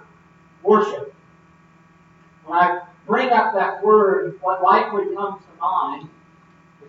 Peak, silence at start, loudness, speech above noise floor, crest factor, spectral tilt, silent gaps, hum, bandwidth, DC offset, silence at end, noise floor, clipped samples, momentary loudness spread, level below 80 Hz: -2 dBFS; 0.65 s; -19 LUFS; 34 dB; 18 dB; -6.5 dB/octave; none; none; 7.2 kHz; under 0.1%; 0.8 s; -52 dBFS; under 0.1%; 13 LU; -70 dBFS